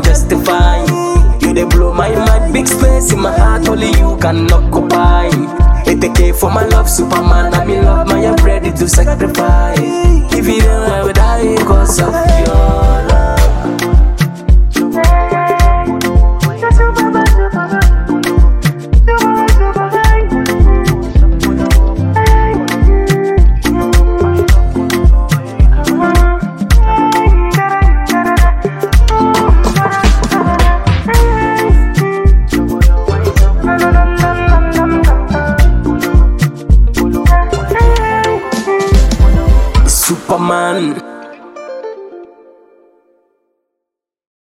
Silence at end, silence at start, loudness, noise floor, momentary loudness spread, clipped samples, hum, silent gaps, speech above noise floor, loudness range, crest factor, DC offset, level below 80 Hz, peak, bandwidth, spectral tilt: 2.2 s; 0 s; -11 LUFS; -79 dBFS; 3 LU; 0.1%; none; none; 70 dB; 1 LU; 8 dB; under 0.1%; -10 dBFS; 0 dBFS; 15.5 kHz; -5.5 dB/octave